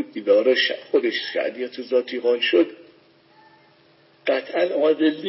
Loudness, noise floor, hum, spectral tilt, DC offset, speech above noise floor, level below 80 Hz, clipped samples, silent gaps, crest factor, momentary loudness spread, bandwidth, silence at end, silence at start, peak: -21 LUFS; -56 dBFS; none; -7 dB/octave; under 0.1%; 35 dB; -84 dBFS; under 0.1%; none; 16 dB; 7 LU; 5.8 kHz; 0 s; 0 s; -6 dBFS